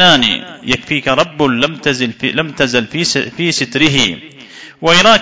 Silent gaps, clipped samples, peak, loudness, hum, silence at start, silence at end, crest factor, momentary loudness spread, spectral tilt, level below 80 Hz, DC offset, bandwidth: none; 0.2%; 0 dBFS; -13 LUFS; none; 0 s; 0 s; 14 dB; 9 LU; -3.5 dB/octave; -44 dBFS; under 0.1%; 8 kHz